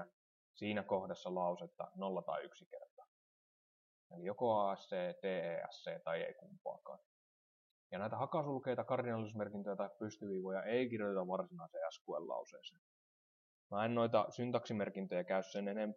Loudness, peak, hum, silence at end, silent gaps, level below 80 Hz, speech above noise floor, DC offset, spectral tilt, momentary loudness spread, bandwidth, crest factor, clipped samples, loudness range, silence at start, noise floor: -41 LUFS; -20 dBFS; none; 0 s; 0.13-0.54 s, 2.66-2.71 s, 2.91-2.97 s, 3.08-4.10 s, 6.61-6.65 s, 7.06-7.90 s, 12.01-12.05 s, 12.78-13.70 s; under -90 dBFS; over 49 dB; under 0.1%; -6.5 dB/octave; 14 LU; 7.2 kHz; 22 dB; under 0.1%; 4 LU; 0 s; under -90 dBFS